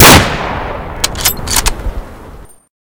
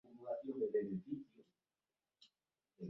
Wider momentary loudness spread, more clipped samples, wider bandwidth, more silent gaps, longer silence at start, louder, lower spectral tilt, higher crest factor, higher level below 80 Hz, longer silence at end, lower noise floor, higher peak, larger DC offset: first, 18 LU vs 10 LU; first, 2% vs under 0.1%; first, over 20 kHz vs 5.8 kHz; neither; about the same, 0 s vs 0.05 s; first, -11 LUFS vs -43 LUFS; second, -3 dB/octave vs -8 dB/octave; second, 12 dB vs 18 dB; first, -22 dBFS vs -86 dBFS; first, 0.4 s vs 0 s; second, -33 dBFS vs under -90 dBFS; first, 0 dBFS vs -28 dBFS; neither